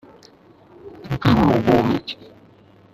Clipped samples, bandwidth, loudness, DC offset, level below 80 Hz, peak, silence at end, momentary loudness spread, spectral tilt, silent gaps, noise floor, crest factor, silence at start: under 0.1%; 14.5 kHz; -18 LUFS; under 0.1%; -42 dBFS; -2 dBFS; 0.8 s; 19 LU; -8 dB/octave; none; -50 dBFS; 18 dB; 0.85 s